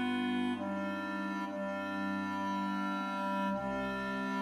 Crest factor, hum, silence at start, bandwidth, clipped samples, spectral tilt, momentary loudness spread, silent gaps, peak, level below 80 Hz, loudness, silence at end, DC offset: 12 dB; none; 0 s; 14.5 kHz; under 0.1%; -6 dB/octave; 3 LU; none; -24 dBFS; -66 dBFS; -36 LUFS; 0 s; under 0.1%